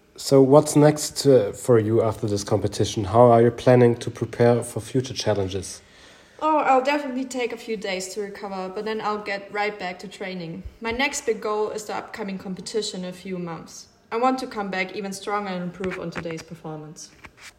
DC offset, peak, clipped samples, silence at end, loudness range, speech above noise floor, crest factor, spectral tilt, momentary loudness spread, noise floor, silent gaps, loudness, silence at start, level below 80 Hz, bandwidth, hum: under 0.1%; -2 dBFS; under 0.1%; 0.1 s; 9 LU; 27 dB; 22 dB; -5.5 dB/octave; 17 LU; -50 dBFS; none; -22 LUFS; 0.15 s; -56 dBFS; 16 kHz; none